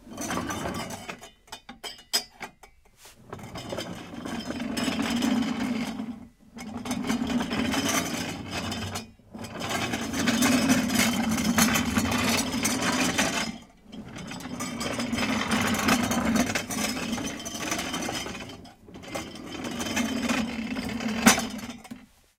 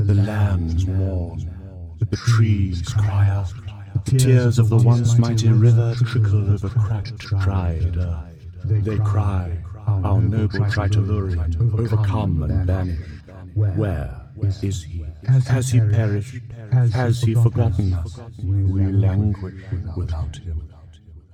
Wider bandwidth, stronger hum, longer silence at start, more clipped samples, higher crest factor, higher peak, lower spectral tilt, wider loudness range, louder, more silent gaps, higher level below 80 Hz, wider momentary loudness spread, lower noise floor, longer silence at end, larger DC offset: first, 17.5 kHz vs 10.5 kHz; neither; about the same, 0 s vs 0 s; neither; first, 26 dB vs 16 dB; about the same, -2 dBFS vs -4 dBFS; second, -3 dB/octave vs -7.5 dB/octave; first, 9 LU vs 6 LU; second, -27 LUFS vs -20 LUFS; neither; second, -52 dBFS vs -34 dBFS; first, 19 LU vs 14 LU; first, -55 dBFS vs -43 dBFS; first, 0.35 s vs 0.15 s; neither